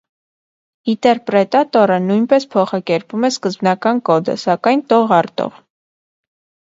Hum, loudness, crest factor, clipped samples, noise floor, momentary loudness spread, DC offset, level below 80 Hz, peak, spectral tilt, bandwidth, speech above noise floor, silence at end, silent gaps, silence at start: none; -15 LUFS; 16 dB; under 0.1%; under -90 dBFS; 7 LU; under 0.1%; -64 dBFS; 0 dBFS; -6 dB/octave; 7.8 kHz; over 75 dB; 1.2 s; none; 0.85 s